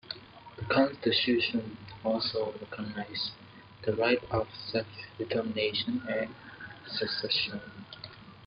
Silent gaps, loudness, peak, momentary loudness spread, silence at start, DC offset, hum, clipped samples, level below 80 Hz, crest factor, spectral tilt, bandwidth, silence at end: none; -31 LUFS; -12 dBFS; 18 LU; 0.05 s; under 0.1%; none; under 0.1%; -62 dBFS; 20 dB; -8 dB/octave; 5.8 kHz; 0 s